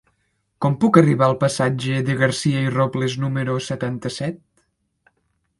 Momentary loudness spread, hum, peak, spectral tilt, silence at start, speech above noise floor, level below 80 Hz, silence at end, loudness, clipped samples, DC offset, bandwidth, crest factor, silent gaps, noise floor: 11 LU; none; 0 dBFS; -6 dB/octave; 0.6 s; 50 dB; -56 dBFS; 1.25 s; -20 LUFS; under 0.1%; under 0.1%; 11.5 kHz; 20 dB; none; -69 dBFS